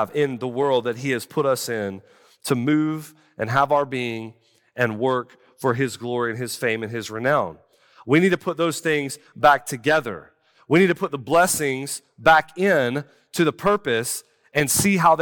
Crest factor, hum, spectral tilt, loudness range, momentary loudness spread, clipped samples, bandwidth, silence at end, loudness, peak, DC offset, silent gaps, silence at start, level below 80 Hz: 18 dB; none; -4.5 dB/octave; 4 LU; 14 LU; under 0.1%; 18 kHz; 0 s; -22 LUFS; -4 dBFS; under 0.1%; none; 0 s; -58 dBFS